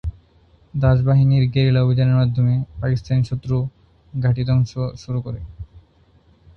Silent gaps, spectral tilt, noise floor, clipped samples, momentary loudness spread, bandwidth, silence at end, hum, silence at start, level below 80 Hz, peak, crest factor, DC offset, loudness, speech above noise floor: none; -9 dB/octave; -54 dBFS; under 0.1%; 16 LU; 6.4 kHz; 0.8 s; none; 0.05 s; -38 dBFS; -2 dBFS; 18 dB; under 0.1%; -19 LUFS; 37 dB